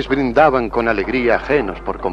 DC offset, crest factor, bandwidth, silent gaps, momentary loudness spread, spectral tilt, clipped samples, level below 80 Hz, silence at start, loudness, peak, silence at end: under 0.1%; 16 dB; 9.4 kHz; none; 7 LU; -7 dB/octave; under 0.1%; -34 dBFS; 0 s; -16 LUFS; 0 dBFS; 0 s